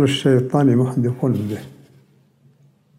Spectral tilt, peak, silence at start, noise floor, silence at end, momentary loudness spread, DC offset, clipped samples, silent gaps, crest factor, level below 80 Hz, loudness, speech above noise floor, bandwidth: -7 dB/octave; -4 dBFS; 0 s; -55 dBFS; 1.25 s; 10 LU; under 0.1%; under 0.1%; none; 16 dB; -60 dBFS; -18 LUFS; 37 dB; 14.5 kHz